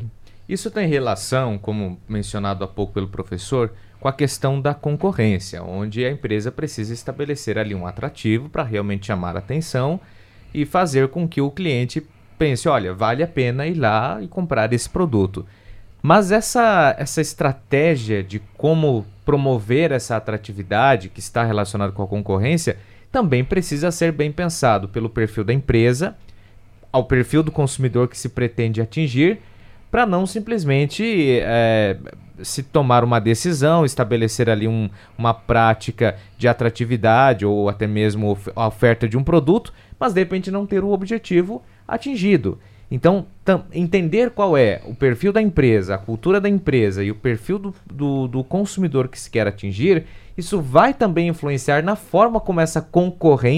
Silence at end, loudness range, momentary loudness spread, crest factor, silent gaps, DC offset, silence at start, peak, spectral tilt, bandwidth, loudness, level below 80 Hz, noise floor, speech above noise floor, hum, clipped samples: 0 s; 5 LU; 10 LU; 18 dB; none; under 0.1%; 0 s; 0 dBFS; -6.5 dB/octave; 15.5 kHz; -19 LUFS; -42 dBFS; -45 dBFS; 26 dB; none; under 0.1%